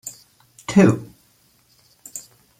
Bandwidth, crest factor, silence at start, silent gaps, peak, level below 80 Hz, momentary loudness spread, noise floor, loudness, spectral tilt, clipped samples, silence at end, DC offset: 16 kHz; 20 dB; 0.05 s; none; -2 dBFS; -58 dBFS; 21 LU; -59 dBFS; -18 LUFS; -6.5 dB/octave; under 0.1%; 0.4 s; under 0.1%